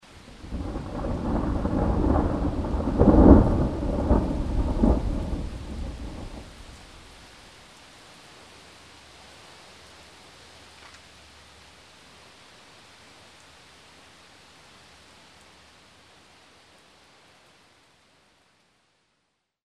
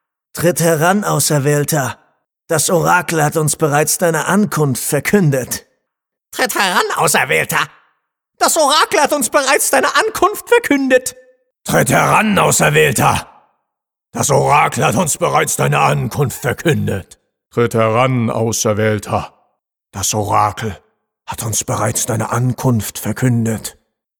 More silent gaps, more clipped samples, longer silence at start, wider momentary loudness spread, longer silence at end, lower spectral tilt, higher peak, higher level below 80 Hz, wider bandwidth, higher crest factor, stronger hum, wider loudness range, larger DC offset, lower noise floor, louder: neither; neither; second, 0.15 s vs 0.35 s; first, 28 LU vs 10 LU; first, 12.85 s vs 0.5 s; first, -8.5 dB/octave vs -4 dB/octave; about the same, -2 dBFS vs 0 dBFS; first, -32 dBFS vs -48 dBFS; second, 11 kHz vs over 20 kHz; first, 26 dB vs 14 dB; neither; first, 26 LU vs 5 LU; neither; second, -75 dBFS vs -79 dBFS; second, -24 LUFS vs -14 LUFS